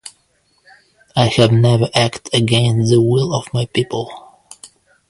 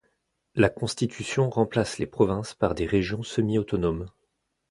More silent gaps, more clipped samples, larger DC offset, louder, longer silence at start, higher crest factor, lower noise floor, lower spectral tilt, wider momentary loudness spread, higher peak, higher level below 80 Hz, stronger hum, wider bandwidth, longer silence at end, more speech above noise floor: neither; neither; neither; first, -15 LUFS vs -26 LUFS; second, 0.05 s vs 0.55 s; about the same, 16 dB vs 20 dB; second, -60 dBFS vs -76 dBFS; about the same, -6 dB/octave vs -6 dB/octave; first, 10 LU vs 6 LU; first, 0 dBFS vs -6 dBFS; about the same, -48 dBFS vs -46 dBFS; neither; about the same, 11.5 kHz vs 11.5 kHz; second, 0.45 s vs 0.6 s; second, 46 dB vs 51 dB